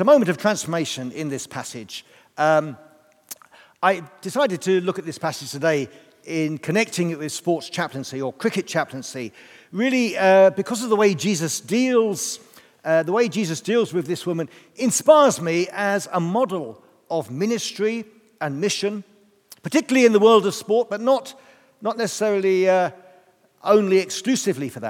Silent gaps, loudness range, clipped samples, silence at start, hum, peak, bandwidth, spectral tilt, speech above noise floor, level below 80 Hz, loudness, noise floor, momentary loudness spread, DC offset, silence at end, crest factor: none; 6 LU; under 0.1%; 0 s; none; -2 dBFS; 17 kHz; -4.5 dB/octave; 35 dB; -78 dBFS; -21 LUFS; -56 dBFS; 16 LU; under 0.1%; 0 s; 20 dB